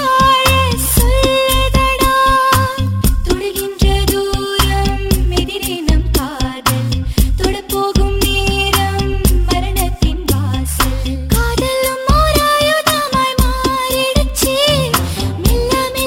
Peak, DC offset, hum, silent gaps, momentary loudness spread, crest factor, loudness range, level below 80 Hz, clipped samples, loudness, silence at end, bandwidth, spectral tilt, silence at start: 0 dBFS; under 0.1%; none; none; 6 LU; 14 dB; 3 LU; -18 dBFS; under 0.1%; -14 LUFS; 0 s; over 20 kHz; -4 dB/octave; 0 s